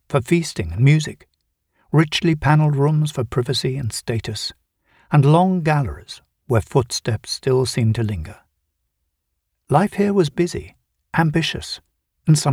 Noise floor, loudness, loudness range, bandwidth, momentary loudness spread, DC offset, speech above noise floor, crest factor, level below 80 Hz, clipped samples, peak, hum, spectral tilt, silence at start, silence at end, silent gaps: -75 dBFS; -19 LUFS; 4 LU; 13.5 kHz; 13 LU; under 0.1%; 56 dB; 20 dB; -46 dBFS; under 0.1%; 0 dBFS; none; -6 dB/octave; 0.1 s; 0 s; none